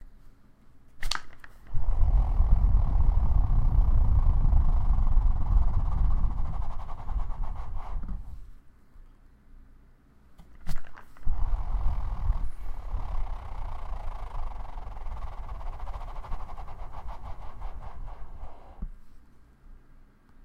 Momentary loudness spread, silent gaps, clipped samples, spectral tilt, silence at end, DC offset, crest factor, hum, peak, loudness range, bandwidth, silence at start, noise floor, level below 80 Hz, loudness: 18 LU; none; under 0.1%; -6.5 dB/octave; 0.7 s; under 0.1%; 16 dB; none; -10 dBFS; 18 LU; 7.4 kHz; 0 s; -56 dBFS; -28 dBFS; -32 LUFS